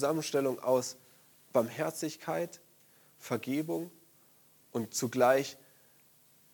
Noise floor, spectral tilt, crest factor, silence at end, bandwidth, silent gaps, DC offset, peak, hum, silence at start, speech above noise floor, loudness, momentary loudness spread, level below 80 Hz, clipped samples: -64 dBFS; -4.5 dB/octave; 22 dB; 1 s; 19 kHz; none; under 0.1%; -12 dBFS; none; 0 s; 32 dB; -33 LUFS; 17 LU; -82 dBFS; under 0.1%